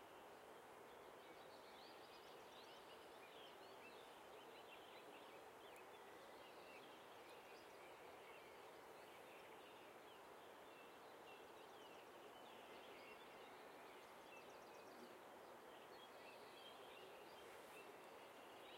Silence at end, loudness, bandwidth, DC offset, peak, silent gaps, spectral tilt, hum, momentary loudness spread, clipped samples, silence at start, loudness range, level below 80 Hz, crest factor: 0 s; -61 LUFS; 16 kHz; under 0.1%; -48 dBFS; none; -3 dB/octave; none; 2 LU; under 0.1%; 0 s; 1 LU; under -90 dBFS; 14 dB